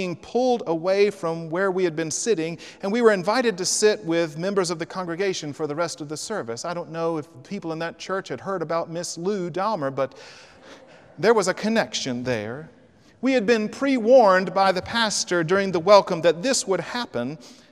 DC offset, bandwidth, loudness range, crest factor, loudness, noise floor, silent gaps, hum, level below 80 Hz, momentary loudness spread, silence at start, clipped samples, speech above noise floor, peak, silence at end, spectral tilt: under 0.1%; 14.5 kHz; 9 LU; 20 dB; -23 LUFS; -47 dBFS; none; none; -64 dBFS; 12 LU; 0 s; under 0.1%; 24 dB; -2 dBFS; 0.2 s; -4 dB/octave